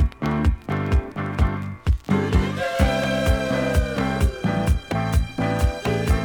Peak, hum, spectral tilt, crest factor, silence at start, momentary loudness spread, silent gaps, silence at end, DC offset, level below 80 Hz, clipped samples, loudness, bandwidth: -6 dBFS; none; -6.5 dB/octave; 16 dB; 0 s; 3 LU; none; 0 s; under 0.1%; -26 dBFS; under 0.1%; -23 LUFS; over 20 kHz